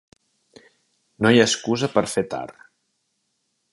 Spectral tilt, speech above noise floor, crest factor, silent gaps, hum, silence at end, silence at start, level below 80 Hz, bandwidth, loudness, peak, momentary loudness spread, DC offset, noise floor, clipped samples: -4 dB/octave; 53 dB; 22 dB; none; none; 1.2 s; 1.2 s; -60 dBFS; 11.5 kHz; -20 LUFS; -2 dBFS; 15 LU; under 0.1%; -73 dBFS; under 0.1%